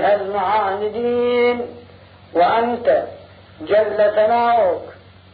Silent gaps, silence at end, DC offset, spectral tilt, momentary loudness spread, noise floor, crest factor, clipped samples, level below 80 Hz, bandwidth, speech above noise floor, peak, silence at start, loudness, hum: none; 0.4 s; under 0.1%; -9.5 dB/octave; 12 LU; -44 dBFS; 12 dB; under 0.1%; -58 dBFS; 5 kHz; 27 dB; -6 dBFS; 0 s; -18 LUFS; none